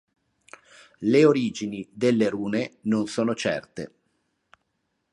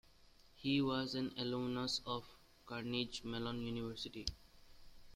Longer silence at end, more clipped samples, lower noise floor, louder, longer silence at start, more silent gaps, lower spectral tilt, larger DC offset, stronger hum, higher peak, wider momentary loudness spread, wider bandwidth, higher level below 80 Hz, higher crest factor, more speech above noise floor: first, 1.25 s vs 0 s; neither; first, -76 dBFS vs -65 dBFS; first, -24 LUFS vs -41 LUFS; first, 1 s vs 0.25 s; neither; about the same, -6 dB/octave vs -5 dB/octave; neither; neither; first, -6 dBFS vs -20 dBFS; first, 15 LU vs 9 LU; second, 11 kHz vs 15.5 kHz; about the same, -66 dBFS vs -62 dBFS; about the same, 20 dB vs 22 dB; first, 53 dB vs 24 dB